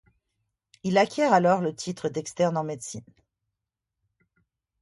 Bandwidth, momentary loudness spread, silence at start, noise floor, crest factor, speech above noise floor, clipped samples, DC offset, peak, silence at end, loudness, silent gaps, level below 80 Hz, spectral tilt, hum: 11.5 kHz; 15 LU; 0.85 s; -86 dBFS; 22 dB; 61 dB; under 0.1%; under 0.1%; -6 dBFS; 1.8 s; -25 LUFS; none; -68 dBFS; -5.5 dB/octave; none